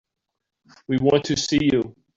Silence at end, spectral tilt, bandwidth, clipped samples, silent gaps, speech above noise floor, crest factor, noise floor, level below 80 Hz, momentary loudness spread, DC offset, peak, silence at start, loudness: 0.25 s; -5 dB/octave; 7.8 kHz; under 0.1%; none; 55 dB; 18 dB; -76 dBFS; -52 dBFS; 5 LU; under 0.1%; -6 dBFS; 0.9 s; -21 LUFS